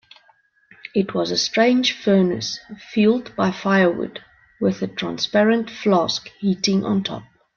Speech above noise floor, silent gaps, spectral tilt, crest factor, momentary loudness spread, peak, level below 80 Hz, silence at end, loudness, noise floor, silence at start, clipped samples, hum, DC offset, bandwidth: 39 dB; none; -5 dB/octave; 16 dB; 11 LU; -4 dBFS; -60 dBFS; 0.35 s; -20 LUFS; -59 dBFS; 0.85 s; under 0.1%; none; under 0.1%; 7.2 kHz